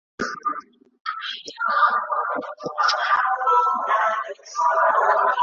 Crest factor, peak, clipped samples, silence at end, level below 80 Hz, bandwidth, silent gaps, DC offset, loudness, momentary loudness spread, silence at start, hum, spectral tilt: 16 dB; -6 dBFS; under 0.1%; 0 s; -70 dBFS; 7.8 kHz; 1.00-1.05 s; under 0.1%; -21 LUFS; 12 LU; 0.2 s; none; -2 dB/octave